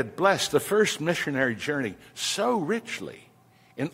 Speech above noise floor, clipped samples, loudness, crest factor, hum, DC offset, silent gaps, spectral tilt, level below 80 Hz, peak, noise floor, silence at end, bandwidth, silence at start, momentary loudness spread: 32 dB; under 0.1%; -26 LUFS; 20 dB; none; under 0.1%; none; -3.5 dB/octave; -66 dBFS; -8 dBFS; -58 dBFS; 0.05 s; 16 kHz; 0 s; 12 LU